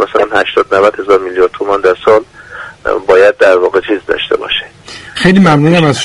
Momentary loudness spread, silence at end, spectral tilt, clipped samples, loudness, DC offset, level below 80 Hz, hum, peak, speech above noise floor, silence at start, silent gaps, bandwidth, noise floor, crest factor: 15 LU; 0 s; -6 dB/octave; 0.3%; -10 LUFS; under 0.1%; -40 dBFS; none; 0 dBFS; 22 dB; 0 s; none; 11.5 kHz; -31 dBFS; 10 dB